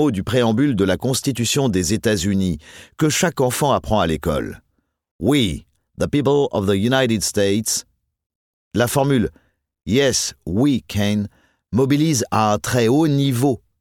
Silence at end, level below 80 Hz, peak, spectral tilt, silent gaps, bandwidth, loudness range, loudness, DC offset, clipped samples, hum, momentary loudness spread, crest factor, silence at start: 0.25 s; -42 dBFS; -4 dBFS; -5 dB/octave; 5.11-5.19 s, 8.26-8.71 s; 17.5 kHz; 2 LU; -19 LUFS; under 0.1%; under 0.1%; none; 7 LU; 16 dB; 0 s